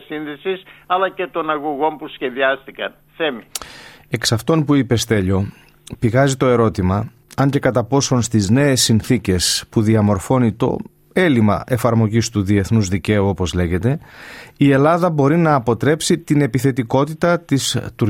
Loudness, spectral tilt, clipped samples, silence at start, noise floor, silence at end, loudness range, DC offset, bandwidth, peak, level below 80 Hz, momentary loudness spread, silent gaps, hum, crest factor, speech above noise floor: -17 LUFS; -5.5 dB/octave; under 0.1%; 0.1 s; -40 dBFS; 0 s; 5 LU; under 0.1%; 16.5 kHz; -2 dBFS; -46 dBFS; 11 LU; none; none; 14 dB; 23 dB